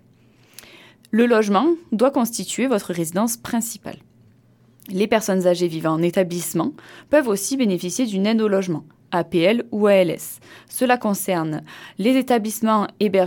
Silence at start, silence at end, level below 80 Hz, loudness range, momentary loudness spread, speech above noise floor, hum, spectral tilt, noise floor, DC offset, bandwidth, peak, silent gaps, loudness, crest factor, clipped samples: 1.15 s; 0 s; -64 dBFS; 3 LU; 11 LU; 34 dB; none; -5 dB/octave; -54 dBFS; under 0.1%; 18 kHz; -4 dBFS; none; -20 LUFS; 16 dB; under 0.1%